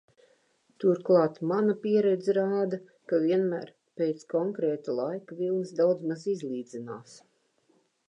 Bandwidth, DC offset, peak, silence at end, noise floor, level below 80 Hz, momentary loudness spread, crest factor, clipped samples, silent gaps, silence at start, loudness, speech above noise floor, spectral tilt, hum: 9.8 kHz; under 0.1%; -12 dBFS; 0.95 s; -69 dBFS; -84 dBFS; 13 LU; 18 dB; under 0.1%; none; 0.8 s; -28 LUFS; 41 dB; -7.5 dB/octave; none